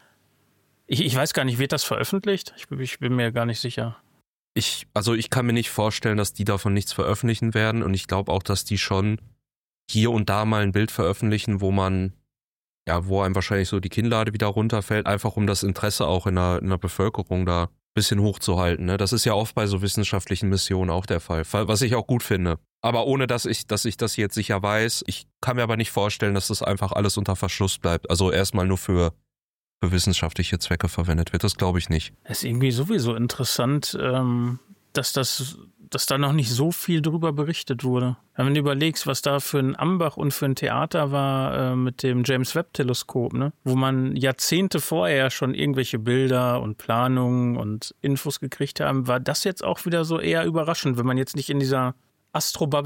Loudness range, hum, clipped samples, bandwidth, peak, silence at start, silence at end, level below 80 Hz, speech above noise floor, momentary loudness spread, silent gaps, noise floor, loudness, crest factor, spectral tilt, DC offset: 2 LU; none; under 0.1%; 17 kHz; -6 dBFS; 0.9 s; 0 s; -44 dBFS; over 67 dB; 5 LU; 4.27-4.55 s, 9.57-9.88 s, 12.44-12.85 s, 17.83-17.94 s, 22.71-22.83 s, 29.44-29.81 s; under -90 dBFS; -24 LUFS; 16 dB; -5 dB/octave; under 0.1%